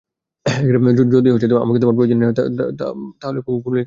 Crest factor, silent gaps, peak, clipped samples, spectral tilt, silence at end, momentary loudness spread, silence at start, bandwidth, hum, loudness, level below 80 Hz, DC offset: 14 dB; none; -2 dBFS; under 0.1%; -8 dB/octave; 0 s; 12 LU; 0.45 s; 7.6 kHz; none; -16 LUFS; -52 dBFS; under 0.1%